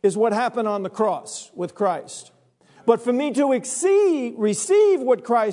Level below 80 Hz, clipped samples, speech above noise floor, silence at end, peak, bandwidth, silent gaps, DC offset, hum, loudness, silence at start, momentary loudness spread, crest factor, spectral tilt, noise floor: -80 dBFS; under 0.1%; 34 dB; 0 s; -2 dBFS; 11 kHz; none; under 0.1%; none; -21 LUFS; 0.05 s; 13 LU; 18 dB; -4.5 dB/octave; -55 dBFS